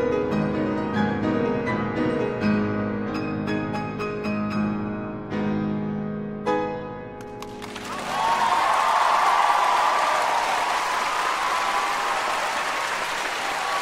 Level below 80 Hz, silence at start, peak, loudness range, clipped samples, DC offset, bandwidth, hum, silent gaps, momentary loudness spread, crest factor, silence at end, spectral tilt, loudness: -52 dBFS; 0 s; -6 dBFS; 7 LU; under 0.1%; under 0.1%; 16 kHz; none; none; 11 LU; 18 dB; 0 s; -4.5 dB/octave; -24 LUFS